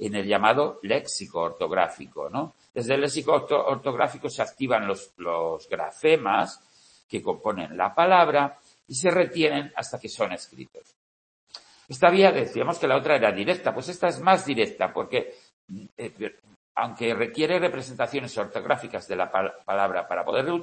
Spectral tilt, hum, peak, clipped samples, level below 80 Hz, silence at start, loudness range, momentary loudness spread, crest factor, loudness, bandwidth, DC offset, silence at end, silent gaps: -4.5 dB/octave; none; -2 dBFS; under 0.1%; -68 dBFS; 0 s; 5 LU; 14 LU; 22 dB; -25 LUFS; 8.8 kHz; under 0.1%; 0 s; 7.04-7.09 s, 10.96-11.47 s, 15.53-15.68 s, 15.92-15.97 s, 16.56-16.75 s